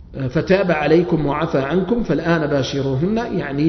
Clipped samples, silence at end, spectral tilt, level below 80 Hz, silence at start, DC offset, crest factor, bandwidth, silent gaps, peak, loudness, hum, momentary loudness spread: under 0.1%; 0 s; -7.5 dB/octave; -38 dBFS; 0 s; under 0.1%; 16 dB; 6.4 kHz; none; 0 dBFS; -18 LUFS; none; 6 LU